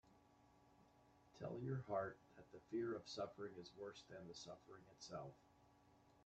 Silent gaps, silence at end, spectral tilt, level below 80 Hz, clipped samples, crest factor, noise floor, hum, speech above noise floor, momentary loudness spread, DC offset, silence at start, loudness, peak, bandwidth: none; 0 s; -6 dB/octave; -82 dBFS; under 0.1%; 20 dB; -73 dBFS; 60 Hz at -80 dBFS; 22 dB; 14 LU; under 0.1%; 0.05 s; -51 LUFS; -32 dBFS; 8.8 kHz